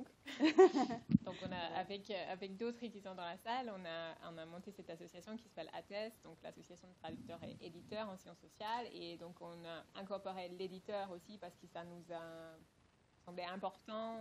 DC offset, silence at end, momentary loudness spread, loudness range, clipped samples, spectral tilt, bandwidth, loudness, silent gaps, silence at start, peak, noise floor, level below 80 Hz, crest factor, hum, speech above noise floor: under 0.1%; 0 s; 17 LU; 13 LU; under 0.1%; -6 dB/octave; 13.5 kHz; -42 LUFS; none; 0 s; -16 dBFS; -72 dBFS; -74 dBFS; 26 dB; none; 30 dB